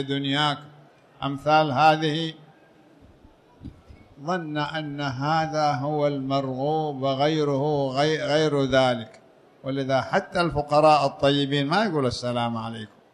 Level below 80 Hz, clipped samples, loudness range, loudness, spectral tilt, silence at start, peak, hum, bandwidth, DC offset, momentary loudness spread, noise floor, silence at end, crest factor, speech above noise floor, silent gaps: -54 dBFS; under 0.1%; 6 LU; -23 LUFS; -6 dB/octave; 0 s; -6 dBFS; none; 11 kHz; under 0.1%; 12 LU; -54 dBFS; 0.25 s; 18 dB; 31 dB; none